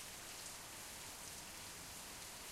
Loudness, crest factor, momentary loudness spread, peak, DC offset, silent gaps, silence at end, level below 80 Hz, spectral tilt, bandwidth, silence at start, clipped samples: -49 LUFS; 18 dB; 1 LU; -34 dBFS; under 0.1%; none; 0 s; -68 dBFS; -1 dB/octave; 16 kHz; 0 s; under 0.1%